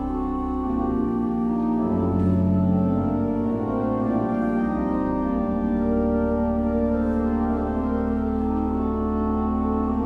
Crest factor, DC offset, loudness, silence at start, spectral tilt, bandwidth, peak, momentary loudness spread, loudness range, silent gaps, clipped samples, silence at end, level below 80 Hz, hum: 12 dB; under 0.1%; -23 LUFS; 0 s; -11 dB/octave; 4 kHz; -10 dBFS; 3 LU; 1 LU; none; under 0.1%; 0 s; -34 dBFS; none